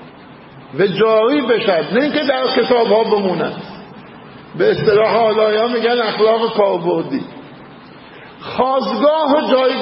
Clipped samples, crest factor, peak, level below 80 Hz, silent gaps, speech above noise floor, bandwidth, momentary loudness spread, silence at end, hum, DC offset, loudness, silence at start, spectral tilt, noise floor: under 0.1%; 16 dB; 0 dBFS; -56 dBFS; none; 24 dB; 5.8 kHz; 14 LU; 0 s; none; under 0.1%; -15 LUFS; 0 s; -10.5 dB/octave; -39 dBFS